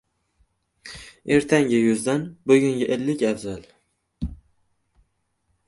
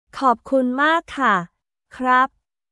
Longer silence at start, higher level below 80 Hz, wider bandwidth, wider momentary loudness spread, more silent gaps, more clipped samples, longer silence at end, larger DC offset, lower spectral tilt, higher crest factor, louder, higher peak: first, 0.85 s vs 0.15 s; first, -46 dBFS vs -58 dBFS; about the same, 11.5 kHz vs 11.5 kHz; first, 20 LU vs 6 LU; neither; neither; first, 1.35 s vs 0.45 s; neither; about the same, -5.5 dB/octave vs -5 dB/octave; about the same, 20 dB vs 16 dB; about the same, -21 LUFS vs -19 LUFS; about the same, -4 dBFS vs -4 dBFS